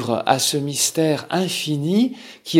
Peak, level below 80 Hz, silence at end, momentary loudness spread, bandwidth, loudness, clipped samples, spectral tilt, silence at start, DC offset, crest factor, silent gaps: 0 dBFS; -68 dBFS; 0 s; 4 LU; 17 kHz; -20 LUFS; under 0.1%; -4 dB/octave; 0 s; under 0.1%; 18 dB; none